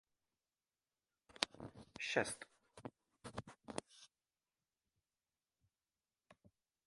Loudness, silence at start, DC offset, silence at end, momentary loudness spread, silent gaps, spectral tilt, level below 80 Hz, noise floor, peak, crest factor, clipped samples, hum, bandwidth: -45 LUFS; 1.3 s; under 0.1%; 0.4 s; 20 LU; none; -2.5 dB/octave; -76 dBFS; under -90 dBFS; -10 dBFS; 40 dB; under 0.1%; none; 11.5 kHz